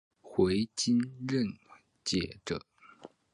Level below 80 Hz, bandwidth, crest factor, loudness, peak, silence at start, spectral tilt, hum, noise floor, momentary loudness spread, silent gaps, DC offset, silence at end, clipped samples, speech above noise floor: -58 dBFS; 11 kHz; 18 dB; -32 LUFS; -14 dBFS; 0.25 s; -5 dB/octave; none; -55 dBFS; 10 LU; none; under 0.1%; 0.25 s; under 0.1%; 24 dB